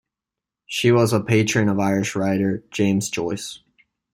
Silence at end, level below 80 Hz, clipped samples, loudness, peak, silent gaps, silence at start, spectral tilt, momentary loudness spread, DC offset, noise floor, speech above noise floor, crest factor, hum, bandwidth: 0.55 s; -58 dBFS; under 0.1%; -21 LUFS; -4 dBFS; none; 0.7 s; -5.5 dB/octave; 10 LU; under 0.1%; -87 dBFS; 67 dB; 18 dB; none; 15.5 kHz